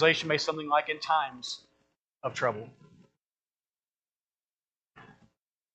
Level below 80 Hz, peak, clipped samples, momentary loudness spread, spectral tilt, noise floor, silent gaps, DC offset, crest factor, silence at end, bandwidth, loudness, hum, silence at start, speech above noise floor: -76 dBFS; -8 dBFS; under 0.1%; 14 LU; -3.5 dB/octave; under -90 dBFS; 2.04-2.08 s, 3.27-3.31 s, 4.16-4.20 s, 4.76-4.80 s; under 0.1%; 24 dB; 0.65 s; 8.8 kHz; -30 LUFS; none; 0 s; over 61 dB